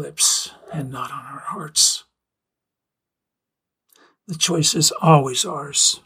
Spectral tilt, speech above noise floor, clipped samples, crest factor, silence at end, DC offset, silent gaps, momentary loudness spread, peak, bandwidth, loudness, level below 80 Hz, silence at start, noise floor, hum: -3 dB/octave; 65 dB; under 0.1%; 20 dB; 0.05 s; under 0.1%; none; 16 LU; -2 dBFS; 16.5 kHz; -17 LUFS; -62 dBFS; 0 s; -84 dBFS; none